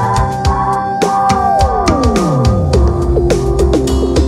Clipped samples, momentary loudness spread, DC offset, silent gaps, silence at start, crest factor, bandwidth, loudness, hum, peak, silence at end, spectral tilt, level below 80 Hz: under 0.1%; 2 LU; under 0.1%; none; 0 s; 12 dB; 14 kHz; -13 LUFS; none; 0 dBFS; 0 s; -6.5 dB/octave; -18 dBFS